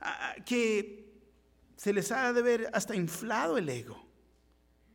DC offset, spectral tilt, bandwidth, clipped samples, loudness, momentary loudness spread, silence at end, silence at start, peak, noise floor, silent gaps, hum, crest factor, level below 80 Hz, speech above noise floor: under 0.1%; -4.5 dB/octave; 18 kHz; under 0.1%; -32 LUFS; 12 LU; 0.95 s; 0 s; -18 dBFS; -67 dBFS; none; none; 16 dB; -68 dBFS; 36 dB